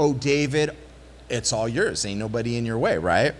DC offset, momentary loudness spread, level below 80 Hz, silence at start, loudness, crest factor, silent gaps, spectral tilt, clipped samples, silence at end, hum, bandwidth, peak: under 0.1%; 6 LU; -48 dBFS; 0 s; -24 LUFS; 16 dB; none; -4.5 dB/octave; under 0.1%; 0 s; none; 12 kHz; -6 dBFS